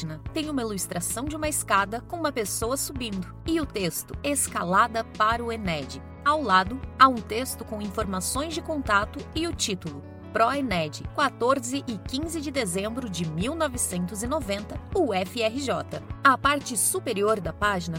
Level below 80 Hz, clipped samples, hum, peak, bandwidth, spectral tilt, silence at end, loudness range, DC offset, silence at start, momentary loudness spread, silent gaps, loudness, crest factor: -44 dBFS; under 0.1%; none; -4 dBFS; 16.5 kHz; -3.5 dB/octave; 0 s; 4 LU; under 0.1%; 0 s; 10 LU; none; -26 LUFS; 24 dB